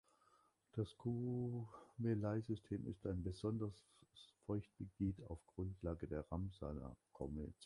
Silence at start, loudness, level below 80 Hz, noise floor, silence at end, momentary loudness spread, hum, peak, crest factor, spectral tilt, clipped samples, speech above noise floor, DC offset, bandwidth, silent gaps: 0.75 s; -46 LUFS; -60 dBFS; -77 dBFS; 0 s; 11 LU; none; -30 dBFS; 18 dB; -9 dB/octave; under 0.1%; 31 dB; under 0.1%; 11.5 kHz; none